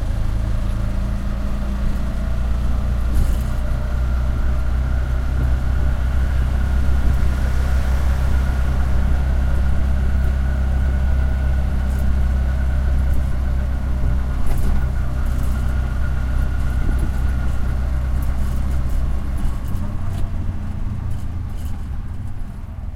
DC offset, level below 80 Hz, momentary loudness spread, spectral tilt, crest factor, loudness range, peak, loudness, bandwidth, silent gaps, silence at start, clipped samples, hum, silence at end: under 0.1%; -20 dBFS; 6 LU; -7.5 dB/octave; 12 dB; 4 LU; -4 dBFS; -22 LUFS; 12.5 kHz; none; 0 s; under 0.1%; none; 0 s